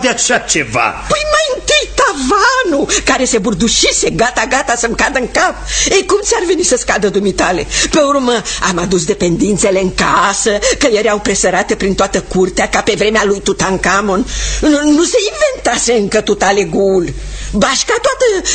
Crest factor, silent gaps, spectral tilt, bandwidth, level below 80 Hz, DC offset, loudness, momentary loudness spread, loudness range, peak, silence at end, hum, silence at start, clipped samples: 12 dB; none; -3 dB/octave; 9.6 kHz; -30 dBFS; under 0.1%; -12 LUFS; 4 LU; 1 LU; 0 dBFS; 0 s; none; 0 s; under 0.1%